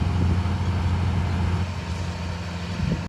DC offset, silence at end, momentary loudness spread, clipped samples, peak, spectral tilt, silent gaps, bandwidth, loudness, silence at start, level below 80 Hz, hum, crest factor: under 0.1%; 0 s; 7 LU; under 0.1%; -10 dBFS; -7 dB/octave; none; 10 kHz; -26 LUFS; 0 s; -36 dBFS; none; 14 dB